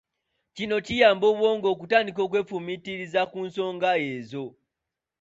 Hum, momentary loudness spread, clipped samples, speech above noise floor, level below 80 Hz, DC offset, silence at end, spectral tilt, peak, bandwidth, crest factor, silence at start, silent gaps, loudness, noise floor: none; 14 LU; under 0.1%; 62 dB; -62 dBFS; under 0.1%; 0.7 s; -5 dB/octave; -6 dBFS; 7.8 kHz; 20 dB; 0.55 s; none; -25 LUFS; -86 dBFS